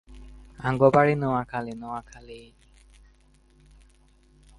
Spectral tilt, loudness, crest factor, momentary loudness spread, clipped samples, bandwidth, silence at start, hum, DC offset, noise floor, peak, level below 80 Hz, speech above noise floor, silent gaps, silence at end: -8 dB/octave; -24 LUFS; 24 dB; 26 LU; under 0.1%; 11.5 kHz; 0.1 s; none; under 0.1%; -59 dBFS; -4 dBFS; -52 dBFS; 34 dB; none; 2.15 s